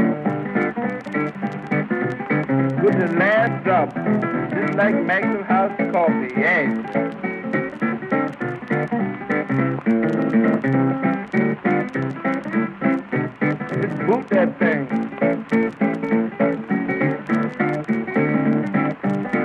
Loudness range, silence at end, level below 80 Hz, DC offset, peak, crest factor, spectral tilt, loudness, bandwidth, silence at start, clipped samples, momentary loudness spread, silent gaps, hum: 3 LU; 0 s; -62 dBFS; under 0.1%; -4 dBFS; 16 dB; -9 dB/octave; -21 LUFS; 6.6 kHz; 0 s; under 0.1%; 6 LU; none; none